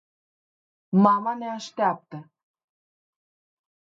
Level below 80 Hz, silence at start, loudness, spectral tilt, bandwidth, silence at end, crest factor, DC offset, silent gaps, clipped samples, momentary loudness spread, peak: -78 dBFS; 0.9 s; -23 LUFS; -7.5 dB/octave; 7.4 kHz; 1.75 s; 22 dB; under 0.1%; none; under 0.1%; 20 LU; -6 dBFS